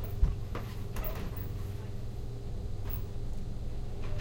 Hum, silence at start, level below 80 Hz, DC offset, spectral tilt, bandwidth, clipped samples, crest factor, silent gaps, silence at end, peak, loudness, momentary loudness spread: none; 0 s; -36 dBFS; under 0.1%; -7 dB/octave; 16.5 kHz; under 0.1%; 20 dB; none; 0 s; -14 dBFS; -39 LUFS; 7 LU